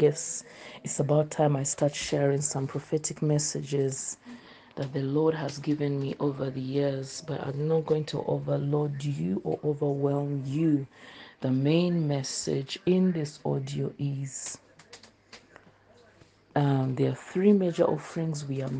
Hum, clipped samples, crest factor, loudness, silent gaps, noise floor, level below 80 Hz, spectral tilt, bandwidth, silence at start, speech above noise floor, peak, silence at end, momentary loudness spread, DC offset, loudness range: none; under 0.1%; 18 dB; -29 LUFS; none; -58 dBFS; -66 dBFS; -6 dB/octave; 9.8 kHz; 0 s; 31 dB; -10 dBFS; 0 s; 10 LU; under 0.1%; 4 LU